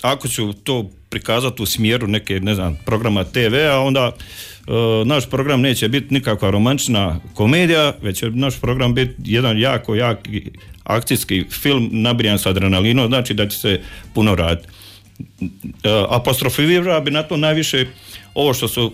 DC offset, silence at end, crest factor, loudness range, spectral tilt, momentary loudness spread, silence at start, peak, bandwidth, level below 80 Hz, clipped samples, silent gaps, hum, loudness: under 0.1%; 0 s; 12 dB; 3 LU; -5 dB/octave; 10 LU; 0 s; -6 dBFS; 16 kHz; -38 dBFS; under 0.1%; none; none; -17 LUFS